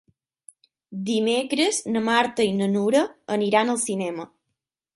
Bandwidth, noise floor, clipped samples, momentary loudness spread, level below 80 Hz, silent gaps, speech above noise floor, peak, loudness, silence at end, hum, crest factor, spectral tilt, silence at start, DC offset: 11.5 kHz; -81 dBFS; under 0.1%; 11 LU; -68 dBFS; none; 59 dB; -6 dBFS; -23 LUFS; 0.7 s; none; 18 dB; -4 dB/octave; 0.9 s; under 0.1%